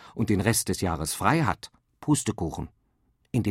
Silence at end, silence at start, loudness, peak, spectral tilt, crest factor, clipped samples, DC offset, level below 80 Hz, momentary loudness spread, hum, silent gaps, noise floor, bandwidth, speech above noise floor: 0 s; 0 s; -27 LUFS; -6 dBFS; -5 dB/octave; 22 dB; under 0.1%; under 0.1%; -48 dBFS; 13 LU; none; none; -69 dBFS; 16 kHz; 43 dB